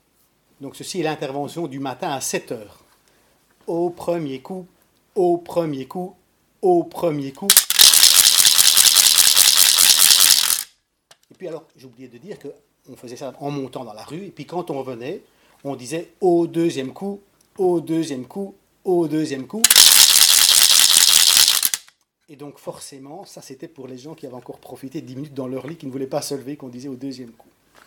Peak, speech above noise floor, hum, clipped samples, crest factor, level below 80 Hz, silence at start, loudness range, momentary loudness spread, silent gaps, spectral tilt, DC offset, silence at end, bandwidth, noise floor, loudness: 0 dBFS; 39 dB; none; 0.2%; 20 dB; -62 dBFS; 0.6 s; 21 LU; 25 LU; none; -0.5 dB/octave; under 0.1%; 0.6 s; over 20 kHz; -62 dBFS; -12 LUFS